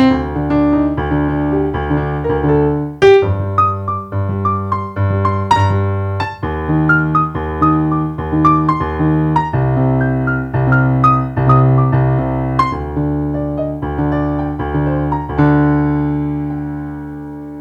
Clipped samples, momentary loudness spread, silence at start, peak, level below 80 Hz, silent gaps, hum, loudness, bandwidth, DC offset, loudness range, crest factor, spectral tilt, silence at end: under 0.1%; 8 LU; 0 s; 0 dBFS; -30 dBFS; none; none; -15 LUFS; 7.8 kHz; under 0.1%; 3 LU; 14 dB; -9 dB/octave; 0 s